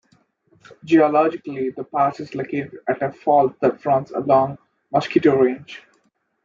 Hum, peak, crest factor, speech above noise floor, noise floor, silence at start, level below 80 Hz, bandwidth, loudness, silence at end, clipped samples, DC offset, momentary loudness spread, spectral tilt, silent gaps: none; -4 dBFS; 16 dB; 46 dB; -66 dBFS; 0.85 s; -68 dBFS; 7.4 kHz; -20 LUFS; 0.7 s; under 0.1%; under 0.1%; 11 LU; -7.5 dB/octave; none